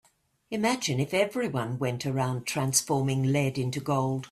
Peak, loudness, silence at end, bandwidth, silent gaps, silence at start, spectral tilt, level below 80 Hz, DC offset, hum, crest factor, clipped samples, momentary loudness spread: -8 dBFS; -28 LUFS; 0.05 s; 15.5 kHz; none; 0.5 s; -4.5 dB/octave; -62 dBFS; under 0.1%; none; 20 dB; under 0.1%; 5 LU